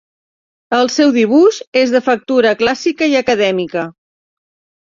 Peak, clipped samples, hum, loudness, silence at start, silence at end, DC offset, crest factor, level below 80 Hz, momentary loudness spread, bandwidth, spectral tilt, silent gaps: -2 dBFS; under 0.1%; none; -13 LUFS; 0.7 s; 0.95 s; under 0.1%; 14 dB; -58 dBFS; 8 LU; 7.6 kHz; -4 dB/octave; 1.67-1.72 s